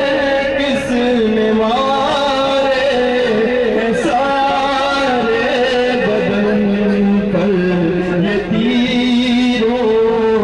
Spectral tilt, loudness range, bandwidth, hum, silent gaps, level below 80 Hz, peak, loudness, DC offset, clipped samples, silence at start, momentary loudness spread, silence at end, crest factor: -6 dB/octave; 0 LU; 11 kHz; none; none; -40 dBFS; -4 dBFS; -14 LUFS; under 0.1%; under 0.1%; 0 s; 2 LU; 0 s; 10 dB